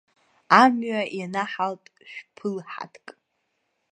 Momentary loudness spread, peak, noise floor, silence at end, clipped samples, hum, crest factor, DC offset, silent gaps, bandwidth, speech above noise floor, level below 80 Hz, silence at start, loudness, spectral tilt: 24 LU; 0 dBFS; -75 dBFS; 0.8 s; under 0.1%; none; 26 dB; under 0.1%; none; 9.6 kHz; 51 dB; -78 dBFS; 0.5 s; -23 LUFS; -5 dB/octave